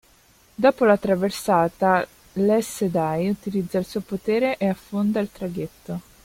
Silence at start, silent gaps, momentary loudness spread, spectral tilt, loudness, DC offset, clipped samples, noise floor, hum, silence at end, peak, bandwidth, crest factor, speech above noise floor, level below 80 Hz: 0.6 s; none; 11 LU; -6 dB/octave; -23 LUFS; under 0.1%; under 0.1%; -56 dBFS; none; 0.25 s; -4 dBFS; 16.5 kHz; 20 dB; 34 dB; -56 dBFS